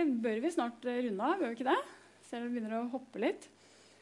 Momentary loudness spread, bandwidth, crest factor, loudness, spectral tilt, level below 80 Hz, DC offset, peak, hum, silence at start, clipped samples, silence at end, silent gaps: 9 LU; 11.5 kHz; 18 dB; -35 LUFS; -5 dB/octave; under -90 dBFS; under 0.1%; -18 dBFS; none; 0 s; under 0.1%; 0.55 s; none